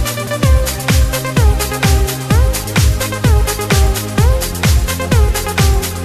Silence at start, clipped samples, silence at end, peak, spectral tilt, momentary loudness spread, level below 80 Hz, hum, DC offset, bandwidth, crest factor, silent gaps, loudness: 0 s; under 0.1%; 0 s; 0 dBFS; -4.5 dB/octave; 2 LU; -16 dBFS; none; under 0.1%; 14.5 kHz; 12 dB; none; -14 LUFS